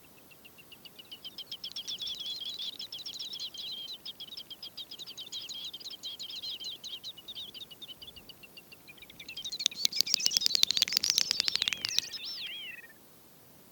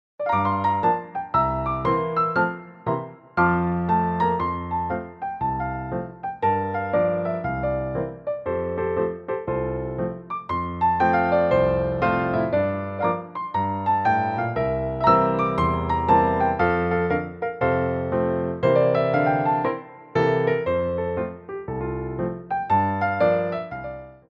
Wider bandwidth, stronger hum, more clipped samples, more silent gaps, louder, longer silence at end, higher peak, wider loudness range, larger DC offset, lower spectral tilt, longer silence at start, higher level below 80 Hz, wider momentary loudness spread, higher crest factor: first, 19 kHz vs 6.4 kHz; neither; neither; neither; second, -32 LUFS vs -23 LUFS; second, 0 s vs 0.15 s; about the same, -2 dBFS vs -4 dBFS; first, 13 LU vs 4 LU; neither; second, 1.5 dB/octave vs -9 dB/octave; second, 0 s vs 0.2 s; second, -74 dBFS vs -44 dBFS; first, 24 LU vs 10 LU; first, 34 dB vs 18 dB